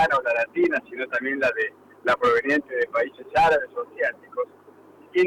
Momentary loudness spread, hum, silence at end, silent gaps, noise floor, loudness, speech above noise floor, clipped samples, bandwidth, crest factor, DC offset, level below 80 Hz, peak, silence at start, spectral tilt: 11 LU; none; 0 s; none; -50 dBFS; -24 LUFS; 27 dB; under 0.1%; 12.5 kHz; 12 dB; under 0.1%; -56 dBFS; -12 dBFS; 0 s; -5 dB/octave